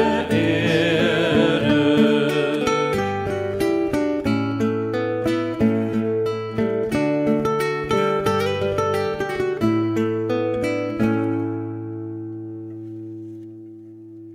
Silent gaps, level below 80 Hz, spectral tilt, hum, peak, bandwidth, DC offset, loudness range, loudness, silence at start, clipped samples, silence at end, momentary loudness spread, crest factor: none; -50 dBFS; -6.5 dB/octave; none; -6 dBFS; 16 kHz; under 0.1%; 6 LU; -21 LUFS; 0 s; under 0.1%; 0 s; 16 LU; 16 dB